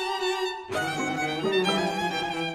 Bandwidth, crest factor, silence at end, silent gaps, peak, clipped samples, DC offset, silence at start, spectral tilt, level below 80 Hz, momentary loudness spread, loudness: 16 kHz; 16 dB; 0 s; none; -12 dBFS; under 0.1%; under 0.1%; 0 s; -4 dB/octave; -62 dBFS; 6 LU; -27 LUFS